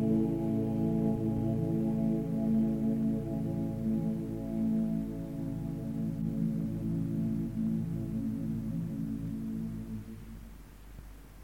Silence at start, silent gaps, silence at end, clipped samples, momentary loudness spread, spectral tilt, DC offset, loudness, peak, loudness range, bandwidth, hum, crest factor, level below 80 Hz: 0 s; none; 0 s; under 0.1%; 13 LU; -10 dB/octave; under 0.1%; -33 LUFS; -18 dBFS; 6 LU; 16.5 kHz; none; 14 dB; -50 dBFS